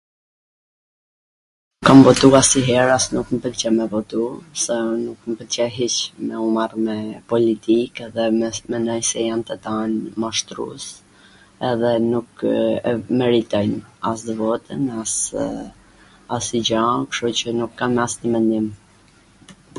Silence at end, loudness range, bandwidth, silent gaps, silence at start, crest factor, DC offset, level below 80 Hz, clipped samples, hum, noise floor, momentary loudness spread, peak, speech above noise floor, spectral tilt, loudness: 0 s; 8 LU; 11.5 kHz; none; 1.8 s; 20 dB; under 0.1%; -50 dBFS; under 0.1%; none; -52 dBFS; 11 LU; 0 dBFS; 33 dB; -4 dB/octave; -19 LUFS